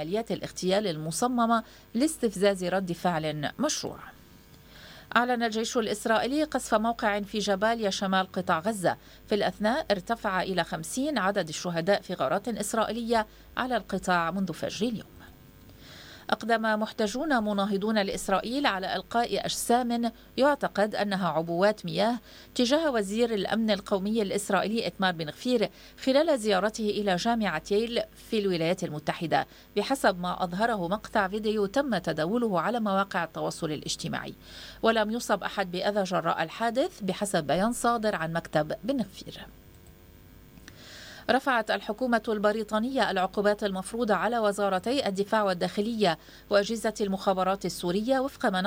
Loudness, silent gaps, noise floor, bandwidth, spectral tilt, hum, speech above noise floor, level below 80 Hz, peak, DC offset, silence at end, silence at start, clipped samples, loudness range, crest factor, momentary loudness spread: -28 LUFS; none; -53 dBFS; 16.5 kHz; -4.5 dB/octave; none; 25 dB; -56 dBFS; -8 dBFS; under 0.1%; 0 s; 0 s; under 0.1%; 3 LU; 20 dB; 7 LU